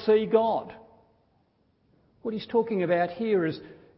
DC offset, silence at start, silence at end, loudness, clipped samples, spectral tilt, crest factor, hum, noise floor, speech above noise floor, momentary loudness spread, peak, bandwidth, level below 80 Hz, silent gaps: under 0.1%; 0 s; 0.25 s; -26 LUFS; under 0.1%; -10.5 dB/octave; 18 dB; none; -68 dBFS; 42 dB; 15 LU; -10 dBFS; 5.8 kHz; -68 dBFS; none